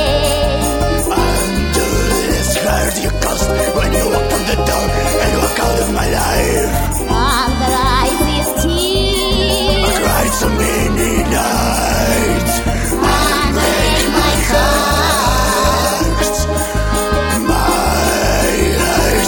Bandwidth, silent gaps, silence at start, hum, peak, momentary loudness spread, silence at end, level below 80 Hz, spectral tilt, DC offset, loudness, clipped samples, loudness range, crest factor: 17.5 kHz; none; 0 s; none; 0 dBFS; 3 LU; 0 s; -20 dBFS; -4 dB/octave; under 0.1%; -14 LUFS; under 0.1%; 2 LU; 14 dB